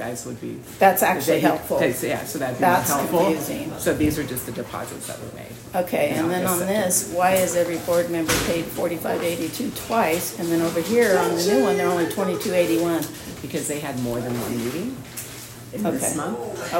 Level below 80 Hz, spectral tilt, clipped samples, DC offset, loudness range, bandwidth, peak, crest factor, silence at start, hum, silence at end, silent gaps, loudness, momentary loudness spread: -50 dBFS; -4 dB/octave; under 0.1%; under 0.1%; 5 LU; 16.5 kHz; -2 dBFS; 20 dB; 0 s; none; 0 s; none; -22 LUFS; 12 LU